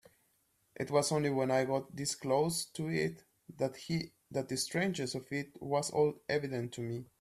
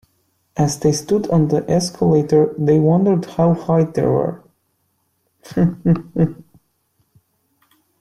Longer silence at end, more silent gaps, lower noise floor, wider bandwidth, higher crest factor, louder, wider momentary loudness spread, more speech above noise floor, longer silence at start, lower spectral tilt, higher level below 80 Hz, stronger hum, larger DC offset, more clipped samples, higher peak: second, 0.15 s vs 1.65 s; neither; first, -75 dBFS vs -67 dBFS; first, 15 kHz vs 12.5 kHz; first, 20 dB vs 14 dB; second, -35 LUFS vs -17 LUFS; first, 9 LU vs 6 LU; second, 41 dB vs 51 dB; first, 0.8 s vs 0.55 s; second, -4.5 dB/octave vs -7 dB/octave; second, -70 dBFS vs -50 dBFS; neither; neither; neither; second, -16 dBFS vs -4 dBFS